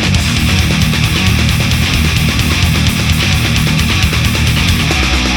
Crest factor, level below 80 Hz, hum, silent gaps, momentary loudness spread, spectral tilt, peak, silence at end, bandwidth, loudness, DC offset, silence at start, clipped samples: 12 dB; -18 dBFS; none; none; 1 LU; -4 dB/octave; 0 dBFS; 0 s; over 20 kHz; -11 LUFS; under 0.1%; 0 s; under 0.1%